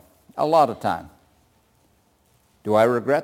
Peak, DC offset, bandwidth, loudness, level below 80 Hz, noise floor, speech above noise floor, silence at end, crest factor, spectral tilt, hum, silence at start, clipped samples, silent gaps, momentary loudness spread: -6 dBFS; under 0.1%; 17 kHz; -21 LUFS; -62 dBFS; -62 dBFS; 42 dB; 0 s; 18 dB; -6.5 dB/octave; none; 0.35 s; under 0.1%; none; 15 LU